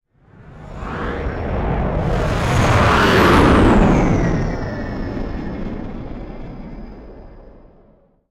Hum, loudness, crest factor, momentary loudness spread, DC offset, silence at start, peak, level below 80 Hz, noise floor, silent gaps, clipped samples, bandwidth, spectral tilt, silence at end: none; -17 LUFS; 14 dB; 22 LU; under 0.1%; 0.4 s; -4 dBFS; -26 dBFS; -52 dBFS; none; under 0.1%; 15 kHz; -6.5 dB/octave; 0.7 s